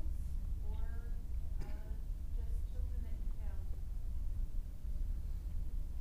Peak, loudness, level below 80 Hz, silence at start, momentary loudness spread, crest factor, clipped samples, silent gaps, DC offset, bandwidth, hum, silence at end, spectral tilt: -28 dBFS; -45 LUFS; -40 dBFS; 0 s; 3 LU; 10 dB; under 0.1%; none; under 0.1%; 15 kHz; none; 0 s; -7.5 dB/octave